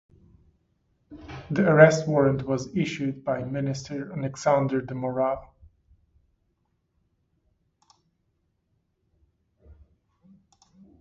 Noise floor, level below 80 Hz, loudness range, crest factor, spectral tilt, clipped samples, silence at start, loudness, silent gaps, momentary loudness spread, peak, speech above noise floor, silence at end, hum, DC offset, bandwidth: -73 dBFS; -58 dBFS; 11 LU; 28 dB; -6.5 dB/octave; under 0.1%; 1.1 s; -24 LUFS; none; 16 LU; 0 dBFS; 50 dB; 1.3 s; none; under 0.1%; 7.8 kHz